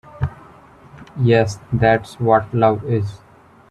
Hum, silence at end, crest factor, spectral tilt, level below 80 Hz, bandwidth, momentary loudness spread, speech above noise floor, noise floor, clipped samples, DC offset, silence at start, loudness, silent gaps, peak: none; 0.55 s; 18 dB; -7.5 dB/octave; -44 dBFS; 11.5 kHz; 11 LU; 28 dB; -45 dBFS; under 0.1%; under 0.1%; 0.15 s; -18 LUFS; none; -2 dBFS